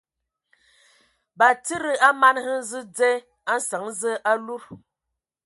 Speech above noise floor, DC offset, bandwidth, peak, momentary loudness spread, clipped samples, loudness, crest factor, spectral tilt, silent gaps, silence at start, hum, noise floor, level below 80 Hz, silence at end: 62 dB; under 0.1%; 12 kHz; -4 dBFS; 11 LU; under 0.1%; -22 LUFS; 20 dB; -2 dB/octave; none; 1.4 s; none; -84 dBFS; -72 dBFS; 0.7 s